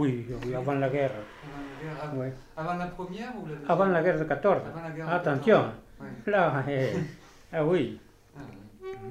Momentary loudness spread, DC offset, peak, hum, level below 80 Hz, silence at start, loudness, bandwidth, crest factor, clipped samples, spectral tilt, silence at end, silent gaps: 18 LU; under 0.1%; -8 dBFS; none; -56 dBFS; 0 s; -28 LUFS; 14.5 kHz; 20 dB; under 0.1%; -7.5 dB/octave; 0 s; none